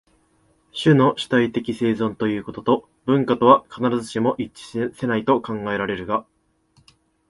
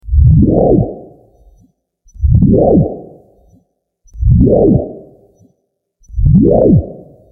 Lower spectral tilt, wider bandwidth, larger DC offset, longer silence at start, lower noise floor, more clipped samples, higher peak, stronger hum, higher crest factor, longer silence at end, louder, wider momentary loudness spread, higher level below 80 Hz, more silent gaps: second, -7 dB/octave vs -14.5 dB/octave; first, 11.5 kHz vs 1.2 kHz; neither; first, 0.75 s vs 0.05 s; second, -62 dBFS vs -66 dBFS; neither; about the same, 0 dBFS vs 0 dBFS; neither; first, 22 dB vs 12 dB; first, 1.1 s vs 0.35 s; second, -21 LUFS vs -11 LUFS; second, 10 LU vs 18 LU; second, -56 dBFS vs -20 dBFS; neither